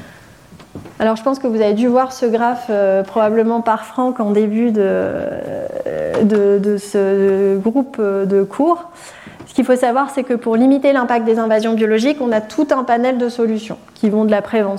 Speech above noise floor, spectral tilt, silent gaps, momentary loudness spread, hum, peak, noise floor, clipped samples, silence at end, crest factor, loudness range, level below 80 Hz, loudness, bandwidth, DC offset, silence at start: 26 dB; -6.5 dB/octave; none; 9 LU; none; -4 dBFS; -41 dBFS; under 0.1%; 0 s; 12 dB; 2 LU; -56 dBFS; -16 LUFS; 13 kHz; under 0.1%; 0 s